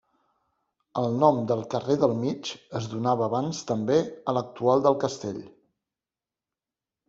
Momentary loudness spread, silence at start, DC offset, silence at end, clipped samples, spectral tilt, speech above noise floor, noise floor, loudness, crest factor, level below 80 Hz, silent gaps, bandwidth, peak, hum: 12 LU; 0.95 s; under 0.1%; 1.6 s; under 0.1%; -6.5 dB/octave; over 65 dB; under -90 dBFS; -26 LUFS; 22 dB; -66 dBFS; none; 8 kHz; -6 dBFS; none